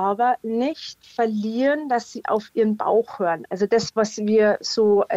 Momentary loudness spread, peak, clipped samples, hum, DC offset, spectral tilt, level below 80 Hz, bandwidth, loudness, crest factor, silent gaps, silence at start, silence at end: 7 LU; -8 dBFS; under 0.1%; none; under 0.1%; -5 dB/octave; -68 dBFS; 8 kHz; -22 LUFS; 14 dB; none; 0 s; 0 s